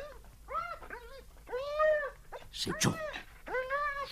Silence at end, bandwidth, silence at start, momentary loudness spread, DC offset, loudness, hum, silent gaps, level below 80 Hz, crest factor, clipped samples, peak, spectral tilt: 0 s; 15.5 kHz; 0 s; 20 LU; under 0.1%; -35 LUFS; none; none; -54 dBFS; 22 dB; under 0.1%; -14 dBFS; -3.5 dB/octave